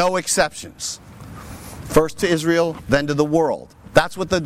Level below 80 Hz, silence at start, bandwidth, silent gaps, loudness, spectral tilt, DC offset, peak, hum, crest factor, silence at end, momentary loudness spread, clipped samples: -42 dBFS; 0 s; 16.5 kHz; none; -20 LUFS; -4 dB/octave; under 0.1%; -2 dBFS; none; 18 dB; 0 s; 18 LU; under 0.1%